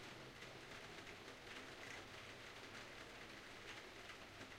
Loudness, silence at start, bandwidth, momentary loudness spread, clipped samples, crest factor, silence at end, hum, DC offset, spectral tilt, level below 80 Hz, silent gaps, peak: -55 LUFS; 0 s; 16 kHz; 2 LU; under 0.1%; 16 dB; 0 s; none; under 0.1%; -3 dB/octave; -72 dBFS; none; -40 dBFS